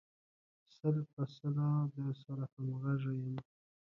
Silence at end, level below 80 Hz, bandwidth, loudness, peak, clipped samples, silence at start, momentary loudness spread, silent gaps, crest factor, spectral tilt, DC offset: 0.55 s; -78 dBFS; 5.8 kHz; -39 LUFS; -22 dBFS; under 0.1%; 0.85 s; 8 LU; 1.13-1.17 s, 2.52-2.57 s; 18 dB; -10 dB/octave; under 0.1%